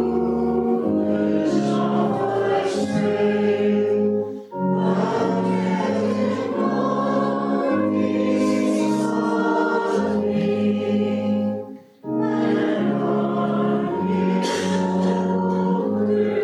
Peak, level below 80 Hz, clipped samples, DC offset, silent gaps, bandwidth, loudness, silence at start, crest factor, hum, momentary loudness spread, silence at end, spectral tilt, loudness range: -8 dBFS; -58 dBFS; under 0.1%; under 0.1%; none; 11 kHz; -21 LUFS; 0 s; 12 dB; none; 3 LU; 0 s; -7 dB/octave; 2 LU